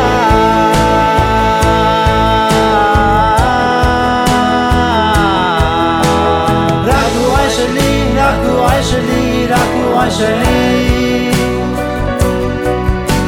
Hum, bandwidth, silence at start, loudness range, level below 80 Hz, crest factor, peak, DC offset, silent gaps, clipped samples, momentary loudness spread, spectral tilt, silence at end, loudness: none; 18 kHz; 0 s; 2 LU; -22 dBFS; 10 dB; 0 dBFS; 0.1%; none; under 0.1%; 4 LU; -5.5 dB/octave; 0 s; -11 LUFS